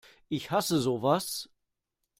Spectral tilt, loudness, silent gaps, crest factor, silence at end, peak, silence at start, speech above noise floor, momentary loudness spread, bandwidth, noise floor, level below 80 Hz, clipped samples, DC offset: -4.5 dB/octave; -30 LUFS; none; 20 dB; 0.75 s; -12 dBFS; 0.3 s; 55 dB; 10 LU; 16 kHz; -84 dBFS; -66 dBFS; under 0.1%; under 0.1%